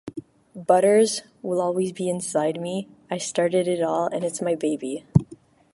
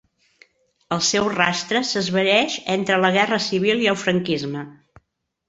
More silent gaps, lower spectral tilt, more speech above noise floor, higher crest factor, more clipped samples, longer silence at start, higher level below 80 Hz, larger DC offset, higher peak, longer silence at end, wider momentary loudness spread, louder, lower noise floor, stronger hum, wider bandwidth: neither; first, -5.5 dB/octave vs -3.5 dB/octave; second, 25 dB vs 47 dB; about the same, 22 dB vs 20 dB; neither; second, 0.05 s vs 0.9 s; first, -54 dBFS vs -60 dBFS; neither; about the same, -2 dBFS vs -2 dBFS; second, 0.4 s vs 0.75 s; first, 13 LU vs 8 LU; second, -23 LUFS vs -20 LUFS; second, -48 dBFS vs -67 dBFS; neither; first, 11.5 kHz vs 8 kHz